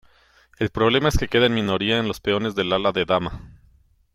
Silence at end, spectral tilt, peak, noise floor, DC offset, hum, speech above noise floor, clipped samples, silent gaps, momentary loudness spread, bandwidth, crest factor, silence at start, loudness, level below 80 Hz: 0.6 s; -5.5 dB/octave; -6 dBFS; -57 dBFS; under 0.1%; none; 36 dB; under 0.1%; none; 8 LU; 16 kHz; 18 dB; 0.6 s; -21 LUFS; -36 dBFS